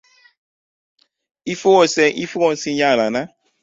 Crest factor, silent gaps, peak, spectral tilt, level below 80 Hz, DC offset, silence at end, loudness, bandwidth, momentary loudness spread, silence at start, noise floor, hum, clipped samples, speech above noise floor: 18 dB; none; -2 dBFS; -4 dB/octave; -62 dBFS; under 0.1%; 0.35 s; -17 LUFS; 7.8 kHz; 14 LU; 1.45 s; under -90 dBFS; none; under 0.1%; over 74 dB